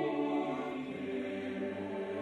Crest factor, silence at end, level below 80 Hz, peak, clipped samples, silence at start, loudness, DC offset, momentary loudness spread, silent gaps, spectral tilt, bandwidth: 14 dB; 0 s; -74 dBFS; -22 dBFS; under 0.1%; 0 s; -37 LUFS; under 0.1%; 5 LU; none; -7 dB/octave; 10 kHz